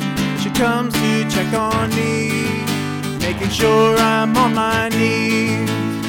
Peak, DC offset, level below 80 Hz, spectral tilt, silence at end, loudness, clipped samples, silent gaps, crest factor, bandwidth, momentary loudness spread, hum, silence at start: -4 dBFS; under 0.1%; -40 dBFS; -5 dB/octave; 0 s; -17 LUFS; under 0.1%; none; 14 dB; 19 kHz; 7 LU; none; 0 s